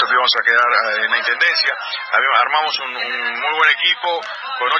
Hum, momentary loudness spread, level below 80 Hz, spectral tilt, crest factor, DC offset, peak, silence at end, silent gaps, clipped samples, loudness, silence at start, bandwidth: none; 8 LU; -76 dBFS; 0 dB/octave; 16 dB; under 0.1%; 0 dBFS; 0 s; none; under 0.1%; -15 LUFS; 0 s; 7.4 kHz